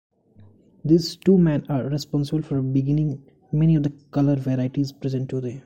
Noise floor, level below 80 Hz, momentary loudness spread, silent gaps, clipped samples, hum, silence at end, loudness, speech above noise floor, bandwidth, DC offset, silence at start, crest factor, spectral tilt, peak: -52 dBFS; -50 dBFS; 9 LU; none; under 0.1%; none; 0.05 s; -22 LUFS; 31 dB; 13 kHz; under 0.1%; 0.85 s; 16 dB; -8 dB/octave; -6 dBFS